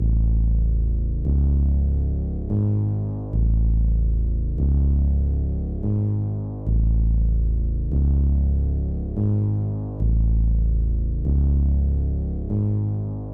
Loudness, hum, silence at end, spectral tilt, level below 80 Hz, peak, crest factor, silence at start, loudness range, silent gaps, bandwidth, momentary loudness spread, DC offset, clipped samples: -23 LUFS; none; 0 s; -14 dB/octave; -22 dBFS; -12 dBFS; 8 dB; 0 s; 1 LU; none; 1.3 kHz; 5 LU; 0.2%; under 0.1%